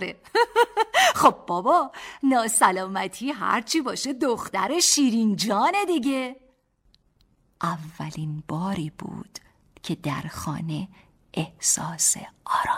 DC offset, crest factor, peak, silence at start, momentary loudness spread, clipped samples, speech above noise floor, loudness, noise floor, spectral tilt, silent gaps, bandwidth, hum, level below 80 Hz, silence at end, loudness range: under 0.1%; 20 dB; -6 dBFS; 0 s; 15 LU; under 0.1%; 40 dB; -23 LUFS; -64 dBFS; -3 dB/octave; none; 16.5 kHz; none; -60 dBFS; 0 s; 11 LU